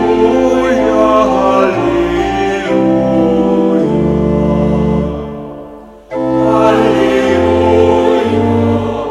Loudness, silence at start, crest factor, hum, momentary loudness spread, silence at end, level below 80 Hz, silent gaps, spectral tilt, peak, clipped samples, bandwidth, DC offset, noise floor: -11 LUFS; 0 s; 12 dB; none; 6 LU; 0 s; -30 dBFS; none; -7.5 dB/octave; 0 dBFS; 0.2%; 11.5 kHz; under 0.1%; -32 dBFS